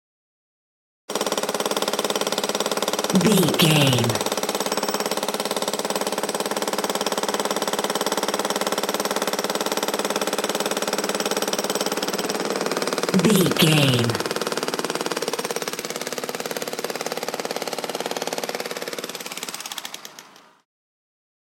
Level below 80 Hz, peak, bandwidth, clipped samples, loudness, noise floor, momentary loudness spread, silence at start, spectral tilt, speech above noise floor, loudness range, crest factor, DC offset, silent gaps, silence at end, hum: -66 dBFS; -2 dBFS; 17 kHz; under 0.1%; -23 LUFS; -47 dBFS; 11 LU; 1.1 s; -3.5 dB/octave; 29 dB; 8 LU; 22 dB; under 0.1%; none; 1.3 s; none